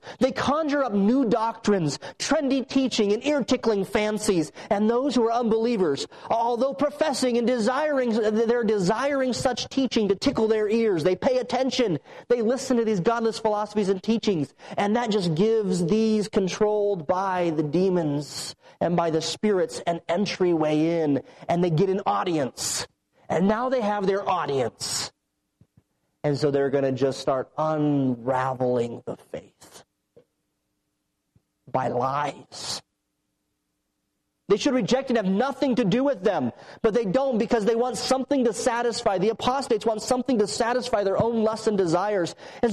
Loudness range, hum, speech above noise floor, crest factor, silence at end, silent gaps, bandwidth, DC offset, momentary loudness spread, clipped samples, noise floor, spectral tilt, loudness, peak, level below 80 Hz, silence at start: 5 LU; none; 54 dB; 12 dB; 0 s; none; 13 kHz; under 0.1%; 6 LU; under 0.1%; -77 dBFS; -5 dB/octave; -24 LUFS; -12 dBFS; -58 dBFS; 0.05 s